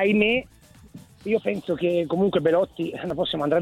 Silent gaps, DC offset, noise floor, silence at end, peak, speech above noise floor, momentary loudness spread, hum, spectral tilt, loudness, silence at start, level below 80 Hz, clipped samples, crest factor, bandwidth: none; under 0.1%; -47 dBFS; 0 s; -6 dBFS; 24 dB; 8 LU; none; -7 dB/octave; -24 LUFS; 0 s; -54 dBFS; under 0.1%; 18 dB; 13.5 kHz